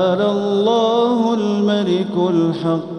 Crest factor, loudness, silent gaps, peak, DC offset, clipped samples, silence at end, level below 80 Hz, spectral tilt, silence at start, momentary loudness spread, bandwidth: 12 dB; -17 LUFS; none; -4 dBFS; under 0.1%; under 0.1%; 0 s; -64 dBFS; -7 dB/octave; 0 s; 3 LU; 9.6 kHz